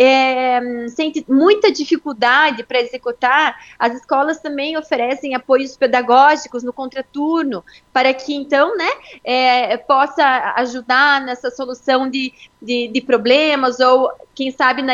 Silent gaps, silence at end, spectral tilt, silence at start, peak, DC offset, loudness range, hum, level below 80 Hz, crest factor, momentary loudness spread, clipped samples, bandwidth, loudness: none; 0 s; -3 dB/octave; 0 s; 0 dBFS; under 0.1%; 2 LU; none; -62 dBFS; 16 dB; 12 LU; under 0.1%; 7.6 kHz; -16 LUFS